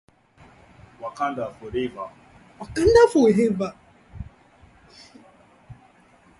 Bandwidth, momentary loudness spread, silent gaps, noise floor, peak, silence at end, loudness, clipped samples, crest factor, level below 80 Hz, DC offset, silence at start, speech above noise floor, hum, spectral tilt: 11.5 kHz; 26 LU; none; -55 dBFS; -4 dBFS; 0.65 s; -21 LUFS; under 0.1%; 22 dB; -46 dBFS; under 0.1%; 1 s; 35 dB; none; -6 dB/octave